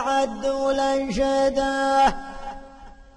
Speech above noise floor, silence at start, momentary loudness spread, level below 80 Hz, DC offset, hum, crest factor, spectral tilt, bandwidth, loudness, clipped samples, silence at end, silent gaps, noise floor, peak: 23 dB; 0 s; 17 LU; -42 dBFS; under 0.1%; none; 14 dB; -4 dB/octave; 11 kHz; -22 LUFS; under 0.1%; 0.15 s; none; -44 dBFS; -10 dBFS